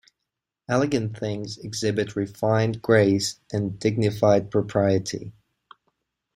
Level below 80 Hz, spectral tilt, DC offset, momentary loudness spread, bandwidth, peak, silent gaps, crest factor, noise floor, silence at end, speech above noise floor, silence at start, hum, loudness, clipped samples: -58 dBFS; -6 dB/octave; under 0.1%; 11 LU; 15.5 kHz; -4 dBFS; none; 20 dB; -84 dBFS; 1.05 s; 61 dB; 0.7 s; none; -24 LUFS; under 0.1%